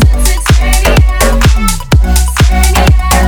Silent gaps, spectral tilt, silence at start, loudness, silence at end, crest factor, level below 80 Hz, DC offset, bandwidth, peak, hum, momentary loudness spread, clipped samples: none; -4.5 dB/octave; 0 s; -9 LUFS; 0 s; 6 dB; -8 dBFS; under 0.1%; 19.5 kHz; 0 dBFS; none; 3 LU; 0.5%